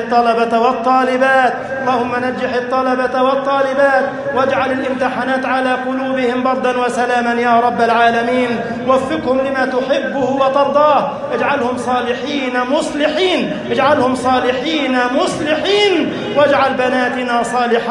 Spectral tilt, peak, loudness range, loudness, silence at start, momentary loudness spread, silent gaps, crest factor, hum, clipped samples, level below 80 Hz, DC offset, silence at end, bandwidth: -4.5 dB/octave; 0 dBFS; 1 LU; -15 LUFS; 0 s; 5 LU; none; 14 dB; none; under 0.1%; -52 dBFS; under 0.1%; 0 s; 11.5 kHz